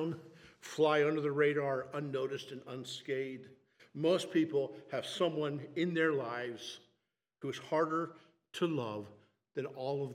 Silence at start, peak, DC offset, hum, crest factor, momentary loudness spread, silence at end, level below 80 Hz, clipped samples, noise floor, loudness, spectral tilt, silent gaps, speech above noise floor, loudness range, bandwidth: 0 s; -16 dBFS; under 0.1%; none; 20 dB; 14 LU; 0 s; -86 dBFS; under 0.1%; -83 dBFS; -36 LUFS; -5.5 dB/octave; none; 48 dB; 4 LU; 14 kHz